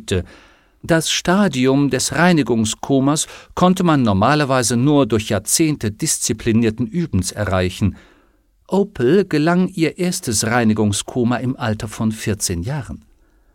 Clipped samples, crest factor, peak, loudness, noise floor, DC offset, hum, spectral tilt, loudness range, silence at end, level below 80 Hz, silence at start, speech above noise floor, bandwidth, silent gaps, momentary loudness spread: under 0.1%; 16 dB; -2 dBFS; -17 LUFS; -57 dBFS; under 0.1%; none; -4.5 dB/octave; 4 LU; 0.55 s; -44 dBFS; 0 s; 39 dB; 17.5 kHz; none; 8 LU